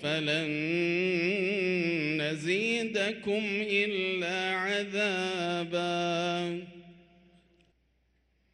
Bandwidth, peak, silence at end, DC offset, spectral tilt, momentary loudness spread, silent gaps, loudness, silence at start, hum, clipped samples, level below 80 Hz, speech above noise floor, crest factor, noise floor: 11.5 kHz; -14 dBFS; 1.6 s; under 0.1%; -5 dB/octave; 4 LU; none; -29 LUFS; 0 s; none; under 0.1%; -72 dBFS; 41 dB; 16 dB; -71 dBFS